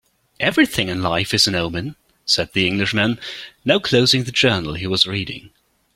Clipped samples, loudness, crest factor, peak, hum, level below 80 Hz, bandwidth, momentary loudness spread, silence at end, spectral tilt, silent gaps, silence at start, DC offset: under 0.1%; -18 LUFS; 20 dB; 0 dBFS; none; -48 dBFS; 16.5 kHz; 13 LU; 0.5 s; -4 dB/octave; none; 0.4 s; under 0.1%